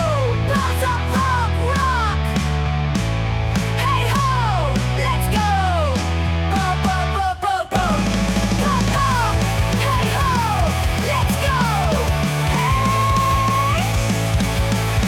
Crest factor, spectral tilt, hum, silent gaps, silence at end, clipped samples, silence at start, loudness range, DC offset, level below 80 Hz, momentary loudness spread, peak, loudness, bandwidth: 10 dB; -5.5 dB/octave; none; none; 0 s; under 0.1%; 0 s; 1 LU; under 0.1%; -26 dBFS; 3 LU; -8 dBFS; -19 LUFS; 18.5 kHz